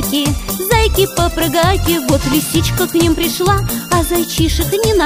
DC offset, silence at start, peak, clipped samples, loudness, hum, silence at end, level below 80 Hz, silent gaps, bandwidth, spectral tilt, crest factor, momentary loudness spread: under 0.1%; 0 s; 0 dBFS; under 0.1%; -14 LUFS; none; 0 s; -24 dBFS; none; 16 kHz; -4.5 dB/octave; 14 dB; 3 LU